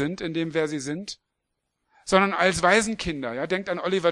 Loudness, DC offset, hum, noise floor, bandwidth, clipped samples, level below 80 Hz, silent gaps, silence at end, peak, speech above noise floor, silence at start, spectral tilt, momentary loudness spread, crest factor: -24 LUFS; under 0.1%; none; -80 dBFS; 12 kHz; under 0.1%; -52 dBFS; none; 0 s; -2 dBFS; 55 dB; 0 s; -4 dB/octave; 14 LU; 22 dB